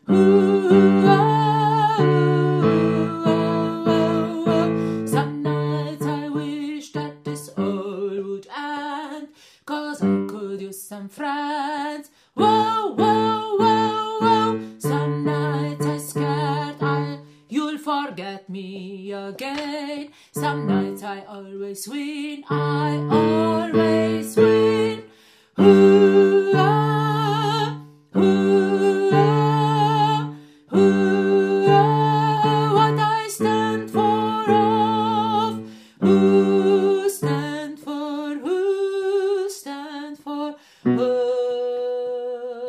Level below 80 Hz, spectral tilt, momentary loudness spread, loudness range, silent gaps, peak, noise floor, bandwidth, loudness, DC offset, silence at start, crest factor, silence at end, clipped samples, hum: -66 dBFS; -7 dB/octave; 16 LU; 11 LU; none; -2 dBFS; -53 dBFS; 15 kHz; -20 LUFS; under 0.1%; 0.1 s; 18 dB; 0 s; under 0.1%; none